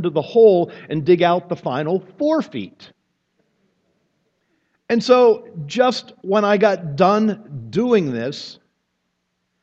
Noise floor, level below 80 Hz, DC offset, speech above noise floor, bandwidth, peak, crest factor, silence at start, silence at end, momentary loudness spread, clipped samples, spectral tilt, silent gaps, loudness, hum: -72 dBFS; -66 dBFS; under 0.1%; 55 dB; 7.8 kHz; 0 dBFS; 18 dB; 0 s; 1.1 s; 14 LU; under 0.1%; -6.5 dB/octave; none; -18 LUFS; none